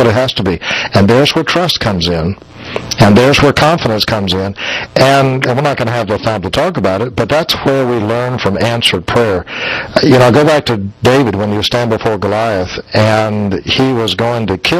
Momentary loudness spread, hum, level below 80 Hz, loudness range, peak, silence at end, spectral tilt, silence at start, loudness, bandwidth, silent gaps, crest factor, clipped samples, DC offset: 8 LU; none; -36 dBFS; 3 LU; 0 dBFS; 0 s; -5.5 dB/octave; 0 s; -11 LUFS; 15.5 kHz; none; 12 dB; 0.4%; under 0.1%